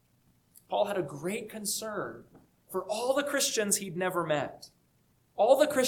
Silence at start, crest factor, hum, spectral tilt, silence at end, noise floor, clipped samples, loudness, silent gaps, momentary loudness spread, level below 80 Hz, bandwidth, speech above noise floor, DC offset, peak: 0.7 s; 20 dB; none; -3 dB/octave; 0 s; -69 dBFS; under 0.1%; -30 LUFS; none; 14 LU; -72 dBFS; 19 kHz; 39 dB; under 0.1%; -10 dBFS